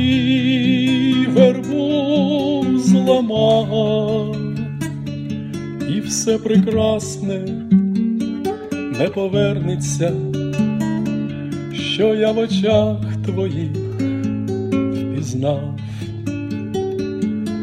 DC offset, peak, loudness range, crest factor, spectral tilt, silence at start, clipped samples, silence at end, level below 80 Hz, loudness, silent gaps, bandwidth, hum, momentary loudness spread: under 0.1%; 0 dBFS; 6 LU; 18 dB; -6 dB/octave; 0 s; under 0.1%; 0 s; -48 dBFS; -19 LUFS; none; 13.5 kHz; none; 10 LU